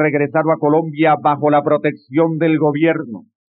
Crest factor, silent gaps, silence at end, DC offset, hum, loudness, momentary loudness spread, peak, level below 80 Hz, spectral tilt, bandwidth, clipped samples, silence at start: 12 dB; none; 0.4 s; under 0.1%; none; -16 LUFS; 5 LU; -2 dBFS; -82 dBFS; -6.5 dB/octave; 4.4 kHz; under 0.1%; 0 s